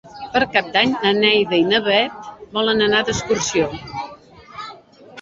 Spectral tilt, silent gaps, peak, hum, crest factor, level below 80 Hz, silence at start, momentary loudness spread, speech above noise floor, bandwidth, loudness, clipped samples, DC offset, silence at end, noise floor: -3 dB/octave; none; 0 dBFS; none; 18 dB; -50 dBFS; 0.05 s; 19 LU; 24 dB; 7.8 kHz; -17 LUFS; under 0.1%; under 0.1%; 0 s; -42 dBFS